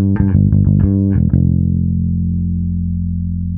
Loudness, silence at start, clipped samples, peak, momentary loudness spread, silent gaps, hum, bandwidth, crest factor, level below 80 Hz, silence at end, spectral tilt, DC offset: -15 LUFS; 0 s; under 0.1%; 0 dBFS; 7 LU; none; none; 2.3 kHz; 12 dB; -24 dBFS; 0 s; -15.5 dB/octave; under 0.1%